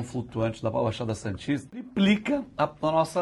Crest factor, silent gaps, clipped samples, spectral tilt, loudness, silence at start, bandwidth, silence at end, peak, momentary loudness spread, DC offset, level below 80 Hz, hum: 16 dB; none; under 0.1%; -6.5 dB/octave; -28 LUFS; 0 s; 12 kHz; 0 s; -10 dBFS; 8 LU; under 0.1%; -54 dBFS; none